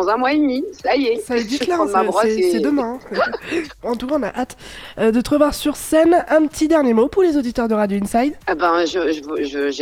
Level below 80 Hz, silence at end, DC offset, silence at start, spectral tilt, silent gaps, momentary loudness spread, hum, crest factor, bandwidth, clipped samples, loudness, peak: -44 dBFS; 0 s; under 0.1%; 0 s; -4.5 dB/octave; none; 9 LU; none; 16 dB; 16.5 kHz; under 0.1%; -18 LUFS; -2 dBFS